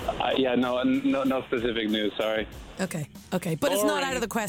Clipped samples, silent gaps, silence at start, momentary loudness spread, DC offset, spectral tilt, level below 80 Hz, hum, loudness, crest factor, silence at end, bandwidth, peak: under 0.1%; none; 0 s; 8 LU; under 0.1%; -4.5 dB/octave; -50 dBFS; none; -27 LUFS; 12 dB; 0 s; 18.5 kHz; -14 dBFS